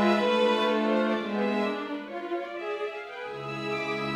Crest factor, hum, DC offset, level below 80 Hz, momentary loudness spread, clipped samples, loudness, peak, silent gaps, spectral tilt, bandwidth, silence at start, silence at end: 16 dB; none; under 0.1%; -70 dBFS; 11 LU; under 0.1%; -28 LUFS; -12 dBFS; none; -5.5 dB/octave; 12 kHz; 0 s; 0 s